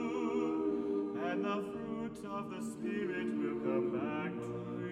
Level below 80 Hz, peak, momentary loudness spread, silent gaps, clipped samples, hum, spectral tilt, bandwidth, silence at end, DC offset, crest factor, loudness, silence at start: -70 dBFS; -22 dBFS; 7 LU; none; under 0.1%; none; -7 dB/octave; 13 kHz; 0 s; under 0.1%; 14 dB; -37 LUFS; 0 s